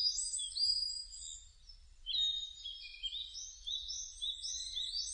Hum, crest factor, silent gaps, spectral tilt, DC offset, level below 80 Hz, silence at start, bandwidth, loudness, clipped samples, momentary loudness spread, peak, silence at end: none; 18 dB; none; 4 dB/octave; under 0.1%; -62 dBFS; 0 s; 10 kHz; -37 LUFS; under 0.1%; 13 LU; -22 dBFS; 0 s